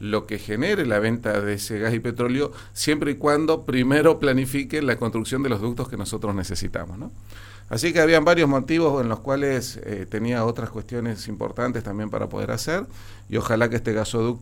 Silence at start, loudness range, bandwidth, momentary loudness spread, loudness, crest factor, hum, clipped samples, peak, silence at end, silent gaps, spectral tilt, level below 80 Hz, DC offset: 0 s; 6 LU; 16.5 kHz; 12 LU; -23 LUFS; 20 dB; none; under 0.1%; -2 dBFS; 0 s; none; -5.5 dB/octave; -44 dBFS; under 0.1%